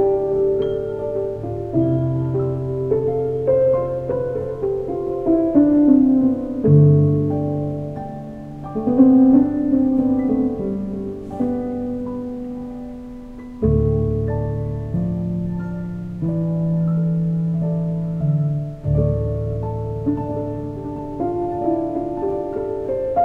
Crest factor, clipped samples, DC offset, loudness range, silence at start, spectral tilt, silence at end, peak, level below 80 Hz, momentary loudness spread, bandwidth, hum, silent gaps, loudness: 16 dB; under 0.1%; under 0.1%; 7 LU; 0 s; -12 dB/octave; 0 s; -2 dBFS; -38 dBFS; 14 LU; 3.6 kHz; none; none; -20 LUFS